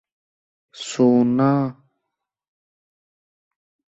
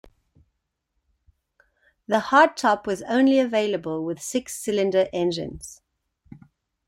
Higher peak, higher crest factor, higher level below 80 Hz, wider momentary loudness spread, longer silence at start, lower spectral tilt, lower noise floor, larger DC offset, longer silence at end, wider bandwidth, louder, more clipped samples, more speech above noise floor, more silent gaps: second, -6 dBFS vs -2 dBFS; about the same, 18 dB vs 22 dB; second, -66 dBFS vs -60 dBFS; about the same, 14 LU vs 12 LU; second, 0.75 s vs 2.1 s; first, -7 dB/octave vs -4.5 dB/octave; first, -82 dBFS vs -77 dBFS; neither; first, 2.25 s vs 0.5 s; second, 8 kHz vs 16 kHz; first, -18 LUFS vs -22 LUFS; neither; first, 64 dB vs 55 dB; neither